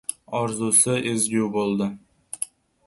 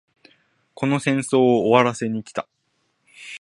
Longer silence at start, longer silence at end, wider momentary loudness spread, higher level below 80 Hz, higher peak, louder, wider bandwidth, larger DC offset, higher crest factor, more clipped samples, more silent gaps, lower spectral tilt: second, 0.1 s vs 0.8 s; first, 0.4 s vs 0.05 s; second, 15 LU vs 21 LU; about the same, -62 dBFS vs -66 dBFS; second, -6 dBFS vs 0 dBFS; about the same, -22 LUFS vs -20 LUFS; about the same, 12 kHz vs 11.5 kHz; neither; about the same, 20 dB vs 22 dB; neither; neither; second, -3.5 dB/octave vs -5.5 dB/octave